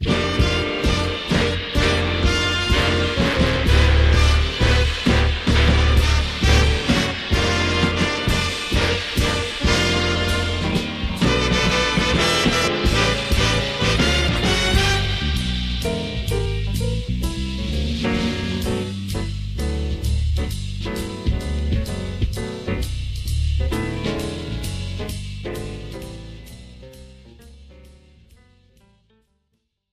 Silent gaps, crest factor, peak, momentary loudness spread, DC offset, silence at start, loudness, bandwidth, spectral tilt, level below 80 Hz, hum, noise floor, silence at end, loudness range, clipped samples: none; 16 dB; -4 dBFS; 11 LU; 0.1%; 0 s; -20 LUFS; 14.5 kHz; -4.5 dB/octave; -24 dBFS; none; -72 dBFS; 2.1 s; 9 LU; under 0.1%